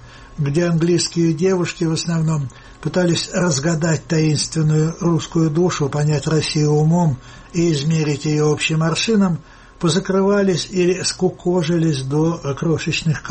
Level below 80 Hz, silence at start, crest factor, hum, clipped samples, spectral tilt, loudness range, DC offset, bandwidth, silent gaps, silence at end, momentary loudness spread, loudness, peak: -46 dBFS; 0 s; 12 dB; none; under 0.1%; -5.5 dB/octave; 1 LU; under 0.1%; 8.8 kHz; none; 0 s; 5 LU; -18 LUFS; -6 dBFS